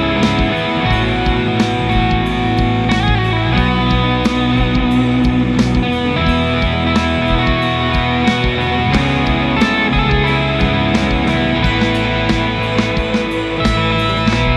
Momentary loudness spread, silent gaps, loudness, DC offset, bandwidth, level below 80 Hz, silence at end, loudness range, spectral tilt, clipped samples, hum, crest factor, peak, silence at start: 2 LU; none; -15 LUFS; under 0.1%; 11.5 kHz; -22 dBFS; 0 s; 1 LU; -6.5 dB/octave; under 0.1%; none; 12 dB; -2 dBFS; 0 s